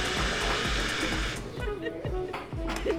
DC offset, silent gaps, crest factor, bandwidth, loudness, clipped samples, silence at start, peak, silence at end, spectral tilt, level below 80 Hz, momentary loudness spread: 0.1%; none; 14 dB; 16 kHz; -30 LUFS; under 0.1%; 0 s; -16 dBFS; 0 s; -3.5 dB/octave; -38 dBFS; 8 LU